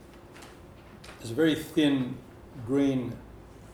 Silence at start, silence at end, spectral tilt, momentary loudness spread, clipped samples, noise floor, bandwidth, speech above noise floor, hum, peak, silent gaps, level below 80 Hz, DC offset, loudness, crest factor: 0 s; 0 s; -6 dB/octave; 24 LU; under 0.1%; -49 dBFS; 18 kHz; 22 dB; none; -12 dBFS; none; -56 dBFS; under 0.1%; -28 LUFS; 18 dB